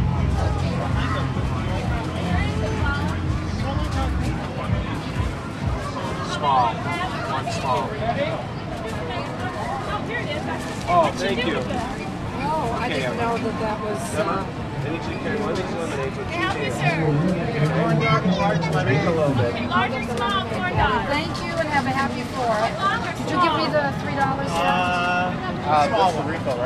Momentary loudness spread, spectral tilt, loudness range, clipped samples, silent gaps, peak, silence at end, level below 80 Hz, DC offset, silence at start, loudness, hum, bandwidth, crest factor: 7 LU; -6 dB/octave; 4 LU; under 0.1%; none; -6 dBFS; 0 s; -36 dBFS; under 0.1%; 0 s; -23 LUFS; none; 13.5 kHz; 16 dB